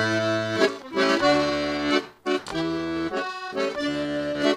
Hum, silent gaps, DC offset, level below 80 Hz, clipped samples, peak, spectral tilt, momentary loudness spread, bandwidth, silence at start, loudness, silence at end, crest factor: none; none; under 0.1%; -54 dBFS; under 0.1%; -6 dBFS; -4.5 dB/octave; 8 LU; 13.5 kHz; 0 s; -25 LUFS; 0 s; 20 dB